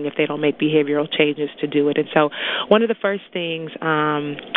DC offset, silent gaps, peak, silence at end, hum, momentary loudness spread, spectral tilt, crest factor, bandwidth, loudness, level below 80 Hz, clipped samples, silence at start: under 0.1%; none; 0 dBFS; 0 s; none; 8 LU; -9 dB/octave; 20 dB; 4.1 kHz; -20 LUFS; -66 dBFS; under 0.1%; 0 s